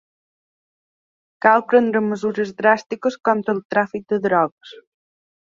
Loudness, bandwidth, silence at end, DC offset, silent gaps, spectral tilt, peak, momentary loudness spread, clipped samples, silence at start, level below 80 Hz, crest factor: -19 LUFS; 7.6 kHz; 0.7 s; under 0.1%; 3.65-3.70 s, 4.52-4.57 s; -6.5 dB/octave; -2 dBFS; 7 LU; under 0.1%; 1.45 s; -68 dBFS; 20 dB